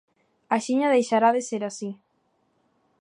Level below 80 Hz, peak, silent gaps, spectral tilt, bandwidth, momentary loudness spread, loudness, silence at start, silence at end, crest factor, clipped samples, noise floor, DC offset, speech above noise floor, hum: -82 dBFS; -8 dBFS; none; -4.5 dB/octave; 11 kHz; 15 LU; -23 LUFS; 0.5 s; 1.05 s; 18 dB; under 0.1%; -70 dBFS; under 0.1%; 47 dB; none